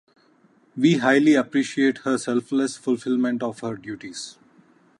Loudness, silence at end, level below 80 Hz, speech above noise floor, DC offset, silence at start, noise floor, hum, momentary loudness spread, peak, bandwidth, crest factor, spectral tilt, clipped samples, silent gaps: -22 LUFS; 0.7 s; -72 dBFS; 37 dB; under 0.1%; 0.75 s; -59 dBFS; none; 17 LU; -4 dBFS; 11.5 kHz; 18 dB; -5 dB/octave; under 0.1%; none